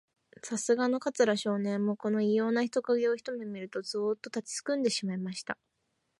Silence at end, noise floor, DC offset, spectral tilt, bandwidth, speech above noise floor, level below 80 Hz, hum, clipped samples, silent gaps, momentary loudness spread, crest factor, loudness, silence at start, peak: 0.65 s; -79 dBFS; under 0.1%; -4.5 dB/octave; 11.5 kHz; 49 dB; -82 dBFS; none; under 0.1%; none; 10 LU; 18 dB; -31 LUFS; 0.45 s; -12 dBFS